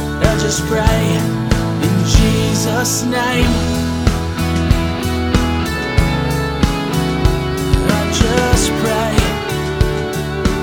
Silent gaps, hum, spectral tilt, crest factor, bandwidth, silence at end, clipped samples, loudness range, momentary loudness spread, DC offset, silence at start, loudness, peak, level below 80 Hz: none; none; -5 dB/octave; 14 dB; over 20 kHz; 0 s; under 0.1%; 2 LU; 5 LU; 0.3%; 0 s; -16 LUFS; 0 dBFS; -22 dBFS